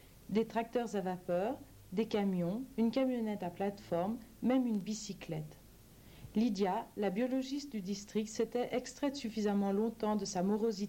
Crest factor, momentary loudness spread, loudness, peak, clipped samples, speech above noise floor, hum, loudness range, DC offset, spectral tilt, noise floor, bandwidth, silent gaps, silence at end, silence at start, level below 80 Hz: 16 dB; 8 LU; -36 LUFS; -20 dBFS; under 0.1%; 23 dB; none; 2 LU; under 0.1%; -6 dB/octave; -58 dBFS; 17 kHz; none; 0 s; 0.05 s; -64 dBFS